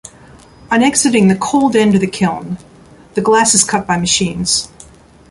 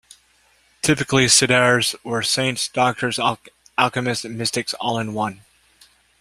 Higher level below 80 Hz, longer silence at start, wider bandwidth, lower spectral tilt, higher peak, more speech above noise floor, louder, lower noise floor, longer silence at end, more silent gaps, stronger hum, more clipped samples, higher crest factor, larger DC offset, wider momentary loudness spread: first, -46 dBFS vs -54 dBFS; second, 0.7 s vs 0.85 s; second, 11.5 kHz vs 16 kHz; about the same, -3.5 dB/octave vs -3 dB/octave; about the same, 0 dBFS vs 0 dBFS; second, 28 dB vs 39 dB; first, -13 LUFS vs -19 LUFS; second, -41 dBFS vs -59 dBFS; second, 0.45 s vs 0.85 s; neither; neither; neither; second, 14 dB vs 22 dB; neither; about the same, 13 LU vs 11 LU